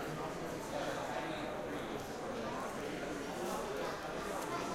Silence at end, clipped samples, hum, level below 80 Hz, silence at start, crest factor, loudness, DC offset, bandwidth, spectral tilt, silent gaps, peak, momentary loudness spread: 0 s; under 0.1%; none; -60 dBFS; 0 s; 14 dB; -41 LUFS; under 0.1%; 16.5 kHz; -4.5 dB/octave; none; -26 dBFS; 2 LU